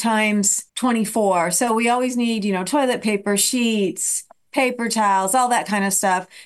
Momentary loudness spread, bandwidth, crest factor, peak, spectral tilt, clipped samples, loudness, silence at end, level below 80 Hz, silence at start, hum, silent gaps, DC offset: 4 LU; 13 kHz; 14 dB; -6 dBFS; -3 dB/octave; under 0.1%; -19 LUFS; 0 s; -66 dBFS; 0 s; none; none; under 0.1%